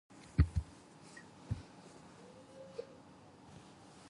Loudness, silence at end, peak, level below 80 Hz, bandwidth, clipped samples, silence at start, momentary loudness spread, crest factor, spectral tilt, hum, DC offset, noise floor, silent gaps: -40 LUFS; 0 s; -16 dBFS; -46 dBFS; 11 kHz; under 0.1%; 0.1 s; 23 LU; 26 dB; -7.5 dB/octave; none; under 0.1%; -59 dBFS; none